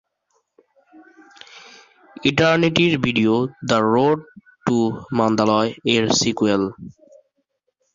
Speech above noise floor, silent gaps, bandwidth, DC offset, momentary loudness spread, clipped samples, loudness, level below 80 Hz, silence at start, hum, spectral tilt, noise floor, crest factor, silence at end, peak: 54 dB; none; 7.6 kHz; under 0.1%; 7 LU; under 0.1%; -19 LUFS; -54 dBFS; 1.55 s; none; -4.5 dB/octave; -72 dBFS; 18 dB; 1.05 s; -2 dBFS